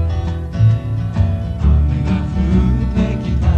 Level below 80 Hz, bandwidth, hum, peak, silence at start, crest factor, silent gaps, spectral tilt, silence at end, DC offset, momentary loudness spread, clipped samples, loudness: -20 dBFS; 7 kHz; none; -2 dBFS; 0 s; 12 dB; none; -9 dB/octave; 0 s; under 0.1%; 5 LU; under 0.1%; -17 LUFS